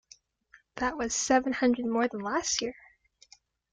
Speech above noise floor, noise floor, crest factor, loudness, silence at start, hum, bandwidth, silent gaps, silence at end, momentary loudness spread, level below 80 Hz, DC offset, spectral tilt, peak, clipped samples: 34 dB; -62 dBFS; 20 dB; -29 LUFS; 0.75 s; none; 9.6 kHz; none; 1 s; 8 LU; -60 dBFS; under 0.1%; -2.5 dB/octave; -10 dBFS; under 0.1%